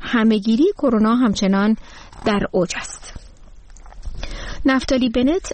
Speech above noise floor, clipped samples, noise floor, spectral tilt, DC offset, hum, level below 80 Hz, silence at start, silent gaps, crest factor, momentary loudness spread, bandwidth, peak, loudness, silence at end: 23 dB; under 0.1%; -41 dBFS; -5.5 dB/octave; 0.1%; none; -36 dBFS; 0 s; none; 14 dB; 17 LU; 8.8 kHz; -6 dBFS; -18 LUFS; 0 s